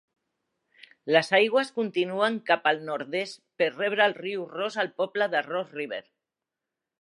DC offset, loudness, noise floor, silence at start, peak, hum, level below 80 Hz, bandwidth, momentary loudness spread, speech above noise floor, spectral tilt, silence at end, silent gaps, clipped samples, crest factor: under 0.1%; -26 LUFS; -88 dBFS; 1.05 s; -6 dBFS; none; -84 dBFS; 11.5 kHz; 12 LU; 61 dB; -4.5 dB/octave; 1 s; none; under 0.1%; 22 dB